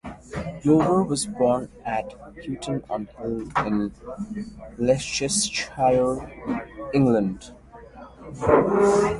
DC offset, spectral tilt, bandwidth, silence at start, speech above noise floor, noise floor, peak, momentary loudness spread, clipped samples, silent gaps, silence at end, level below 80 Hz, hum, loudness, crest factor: under 0.1%; -5 dB/octave; 11.5 kHz; 0.05 s; 21 dB; -44 dBFS; -2 dBFS; 17 LU; under 0.1%; none; 0 s; -48 dBFS; none; -24 LUFS; 22 dB